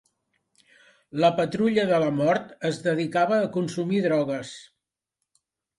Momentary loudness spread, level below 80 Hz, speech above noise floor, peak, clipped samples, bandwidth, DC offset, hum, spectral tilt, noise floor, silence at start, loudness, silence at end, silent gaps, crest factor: 9 LU; -68 dBFS; 60 dB; -8 dBFS; under 0.1%; 11.5 kHz; under 0.1%; none; -6.5 dB/octave; -83 dBFS; 1.15 s; -24 LUFS; 1.15 s; none; 18 dB